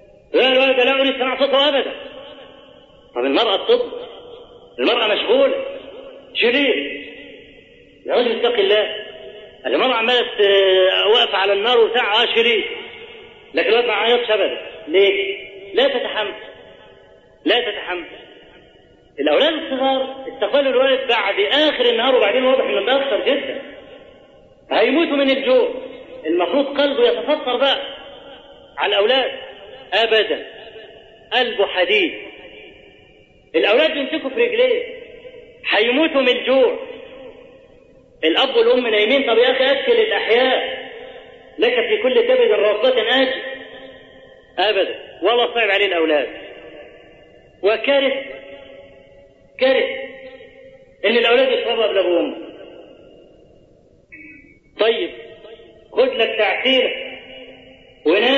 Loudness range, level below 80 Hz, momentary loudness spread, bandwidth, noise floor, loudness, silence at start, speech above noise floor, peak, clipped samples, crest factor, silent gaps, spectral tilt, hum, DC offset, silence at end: 6 LU; -58 dBFS; 21 LU; 7.2 kHz; -51 dBFS; -17 LUFS; 0.3 s; 35 dB; -2 dBFS; under 0.1%; 16 dB; none; -4 dB/octave; none; under 0.1%; 0 s